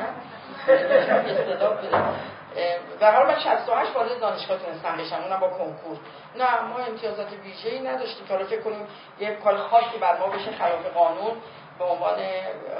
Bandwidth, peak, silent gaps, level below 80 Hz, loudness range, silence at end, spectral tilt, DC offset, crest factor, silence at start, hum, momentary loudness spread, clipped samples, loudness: 5.4 kHz; -4 dBFS; none; -68 dBFS; 7 LU; 0 s; -8.5 dB/octave; under 0.1%; 20 dB; 0 s; none; 15 LU; under 0.1%; -24 LUFS